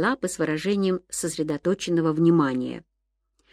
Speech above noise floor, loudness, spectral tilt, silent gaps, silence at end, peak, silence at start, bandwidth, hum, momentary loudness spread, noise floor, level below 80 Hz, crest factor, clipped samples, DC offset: 53 dB; -24 LUFS; -5.5 dB/octave; none; 0.7 s; -8 dBFS; 0 s; 14.5 kHz; none; 10 LU; -77 dBFS; -60 dBFS; 16 dB; under 0.1%; under 0.1%